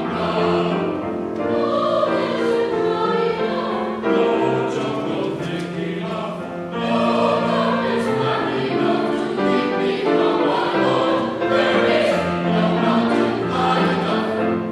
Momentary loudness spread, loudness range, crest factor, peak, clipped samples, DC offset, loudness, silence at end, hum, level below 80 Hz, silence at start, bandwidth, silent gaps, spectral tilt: 7 LU; 4 LU; 14 dB; -4 dBFS; under 0.1%; under 0.1%; -20 LUFS; 0 s; none; -56 dBFS; 0 s; 12 kHz; none; -6.5 dB/octave